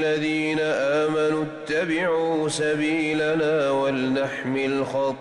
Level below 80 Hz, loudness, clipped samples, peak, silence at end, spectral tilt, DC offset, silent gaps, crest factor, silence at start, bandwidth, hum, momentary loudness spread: -60 dBFS; -23 LUFS; under 0.1%; -14 dBFS; 0 s; -5 dB/octave; under 0.1%; none; 10 dB; 0 s; 11.5 kHz; none; 4 LU